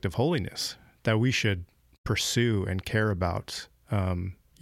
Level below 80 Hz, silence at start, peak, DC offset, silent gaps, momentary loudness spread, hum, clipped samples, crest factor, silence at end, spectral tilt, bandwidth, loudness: -50 dBFS; 0.05 s; -12 dBFS; under 0.1%; 1.98-2.04 s; 10 LU; none; under 0.1%; 16 dB; 0.3 s; -5 dB/octave; 15.5 kHz; -28 LUFS